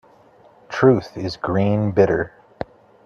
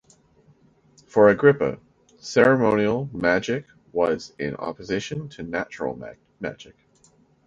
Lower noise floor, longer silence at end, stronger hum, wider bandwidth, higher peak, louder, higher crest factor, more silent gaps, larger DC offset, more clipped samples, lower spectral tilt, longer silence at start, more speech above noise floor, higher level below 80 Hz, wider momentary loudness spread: second, -51 dBFS vs -59 dBFS; about the same, 0.75 s vs 0.85 s; neither; second, 7 kHz vs 7.8 kHz; about the same, 0 dBFS vs -2 dBFS; first, -19 LUFS vs -22 LUFS; about the same, 20 dB vs 20 dB; neither; neither; neither; first, -8 dB/octave vs -6 dB/octave; second, 0.7 s vs 1.15 s; second, 33 dB vs 37 dB; about the same, -52 dBFS vs -56 dBFS; about the same, 18 LU vs 17 LU